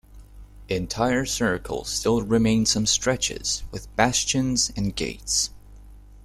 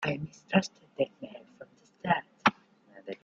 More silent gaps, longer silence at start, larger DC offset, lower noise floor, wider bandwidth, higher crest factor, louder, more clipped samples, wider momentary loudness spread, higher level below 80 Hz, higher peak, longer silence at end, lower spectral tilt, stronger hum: neither; about the same, 0.1 s vs 0 s; neither; second, -45 dBFS vs -57 dBFS; first, 14.5 kHz vs 7.8 kHz; second, 20 dB vs 26 dB; first, -23 LUFS vs -31 LUFS; neither; second, 9 LU vs 18 LU; first, -42 dBFS vs -70 dBFS; first, -4 dBFS vs -8 dBFS; about the same, 0.05 s vs 0.1 s; second, -3 dB/octave vs -5.5 dB/octave; first, 50 Hz at -40 dBFS vs none